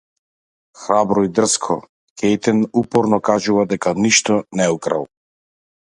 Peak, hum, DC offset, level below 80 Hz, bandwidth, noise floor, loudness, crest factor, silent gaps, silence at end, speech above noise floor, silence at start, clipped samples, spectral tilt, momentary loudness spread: 0 dBFS; none; under 0.1%; -56 dBFS; 11.5 kHz; under -90 dBFS; -17 LUFS; 18 dB; 1.89-2.16 s; 0.9 s; over 73 dB; 0.8 s; under 0.1%; -4 dB/octave; 9 LU